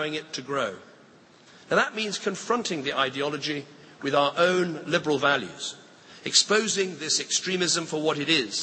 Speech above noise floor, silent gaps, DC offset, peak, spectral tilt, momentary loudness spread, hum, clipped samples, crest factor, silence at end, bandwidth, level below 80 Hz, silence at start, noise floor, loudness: 28 dB; none; under 0.1%; -4 dBFS; -2.5 dB/octave; 12 LU; none; under 0.1%; 22 dB; 0 s; 8.8 kHz; -72 dBFS; 0 s; -54 dBFS; -25 LUFS